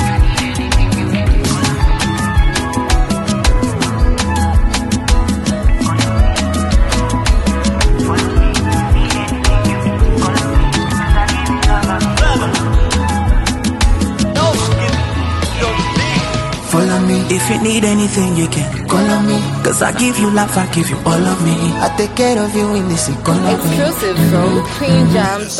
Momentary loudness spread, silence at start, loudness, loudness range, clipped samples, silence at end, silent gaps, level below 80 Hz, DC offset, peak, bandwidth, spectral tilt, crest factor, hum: 3 LU; 0 s; -14 LUFS; 1 LU; under 0.1%; 0 s; none; -18 dBFS; under 0.1%; 0 dBFS; 16 kHz; -5 dB/octave; 12 dB; none